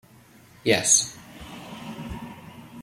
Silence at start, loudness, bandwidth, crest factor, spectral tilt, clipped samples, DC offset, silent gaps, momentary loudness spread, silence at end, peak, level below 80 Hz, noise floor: 0.65 s; -20 LUFS; 16.5 kHz; 24 dB; -1.5 dB/octave; under 0.1%; under 0.1%; none; 25 LU; 0 s; -4 dBFS; -52 dBFS; -52 dBFS